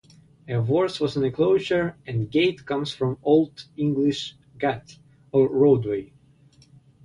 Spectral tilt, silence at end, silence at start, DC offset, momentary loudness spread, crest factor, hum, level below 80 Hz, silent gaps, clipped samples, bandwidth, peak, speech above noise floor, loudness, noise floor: -7 dB/octave; 1 s; 0.45 s; under 0.1%; 11 LU; 16 dB; none; -58 dBFS; none; under 0.1%; 10.5 kHz; -8 dBFS; 33 dB; -23 LUFS; -55 dBFS